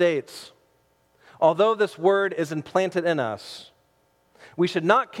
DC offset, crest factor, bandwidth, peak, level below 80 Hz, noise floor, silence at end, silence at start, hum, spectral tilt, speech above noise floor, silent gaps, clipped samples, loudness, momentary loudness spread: under 0.1%; 20 dB; 14.5 kHz; -4 dBFS; -74 dBFS; -65 dBFS; 0 s; 0 s; none; -5.5 dB/octave; 42 dB; none; under 0.1%; -23 LUFS; 20 LU